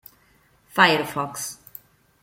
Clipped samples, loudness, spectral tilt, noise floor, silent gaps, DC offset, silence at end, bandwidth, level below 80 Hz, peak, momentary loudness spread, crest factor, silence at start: under 0.1%; -21 LUFS; -3 dB/octave; -60 dBFS; none; under 0.1%; 0.7 s; 17 kHz; -64 dBFS; -2 dBFS; 22 LU; 24 dB; 0.75 s